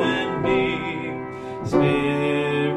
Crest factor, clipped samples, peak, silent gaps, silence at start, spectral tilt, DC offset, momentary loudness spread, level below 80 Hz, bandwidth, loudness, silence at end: 16 dB; under 0.1%; -6 dBFS; none; 0 s; -6.5 dB/octave; under 0.1%; 11 LU; -48 dBFS; 11 kHz; -23 LUFS; 0 s